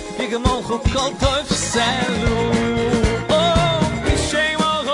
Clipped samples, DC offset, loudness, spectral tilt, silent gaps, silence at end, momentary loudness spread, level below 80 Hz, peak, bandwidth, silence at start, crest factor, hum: under 0.1%; under 0.1%; -18 LUFS; -4.5 dB/octave; none; 0 s; 4 LU; -30 dBFS; -4 dBFS; 11 kHz; 0 s; 14 dB; none